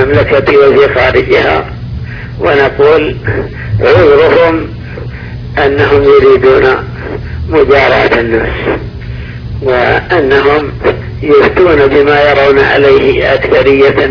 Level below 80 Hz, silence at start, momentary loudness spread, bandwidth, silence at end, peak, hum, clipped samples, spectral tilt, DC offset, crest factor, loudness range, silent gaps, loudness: -26 dBFS; 0 s; 16 LU; 5.4 kHz; 0 s; 0 dBFS; none; 3%; -7.5 dB/octave; under 0.1%; 8 dB; 3 LU; none; -7 LUFS